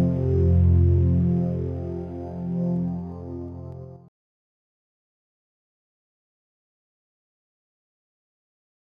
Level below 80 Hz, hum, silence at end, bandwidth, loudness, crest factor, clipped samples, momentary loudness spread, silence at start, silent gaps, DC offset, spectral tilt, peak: -38 dBFS; none; 4.95 s; 2.1 kHz; -23 LUFS; 16 dB; under 0.1%; 18 LU; 0 s; none; under 0.1%; -12.5 dB/octave; -10 dBFS